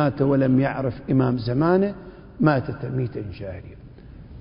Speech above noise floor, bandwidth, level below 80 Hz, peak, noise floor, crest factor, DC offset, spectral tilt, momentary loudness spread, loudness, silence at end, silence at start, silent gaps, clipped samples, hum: 20 dB; 5.4 kHz; -46 dBFS; -6 dBFS; -42 dBFS; 18 dB; under 0.1%; -13 dB/octave; 20 LU; -22 LUFS; 0 s; 0 s; none; under 0.1%; none